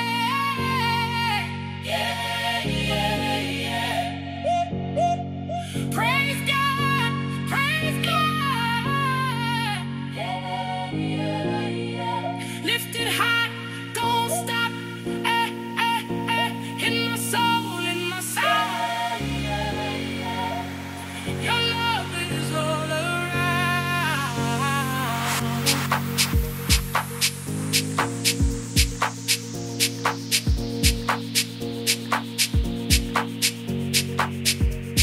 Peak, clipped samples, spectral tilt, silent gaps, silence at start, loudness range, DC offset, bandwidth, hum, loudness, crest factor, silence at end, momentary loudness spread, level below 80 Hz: -2 dBFS; under 0.1%; -3.5 dB/octave; none; 0 s; 3 LU; under 0.1%; 16 kHz; none; -24 LUFS; 22 dB; 0 s; 7 LU; -36 dBFS